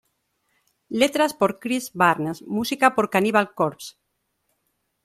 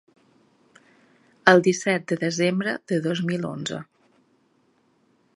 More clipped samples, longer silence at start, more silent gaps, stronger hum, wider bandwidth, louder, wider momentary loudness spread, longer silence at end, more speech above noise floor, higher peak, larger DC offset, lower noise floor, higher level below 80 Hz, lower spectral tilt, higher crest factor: neither; second, 0.9 s vs 1.45 s; neither; neither; first, 16 kHz vs 11.5 kHz; about the same, -22 LUFS vs -23 LUFS; second, 8 LU vs 13 LU; second, 1.15 s vs 1.5 s; first, 52 dB vs 42 dB; about the same, -2 dBFS vs 0 dBFS; neither; first, -74 dBFS vs -65 dBFS; about the same, -64 dBFS vs -68 dBFS; about the same, -4.5 dB/octave vs -5 dB/octave; about the same, 22 dB vs 26 dB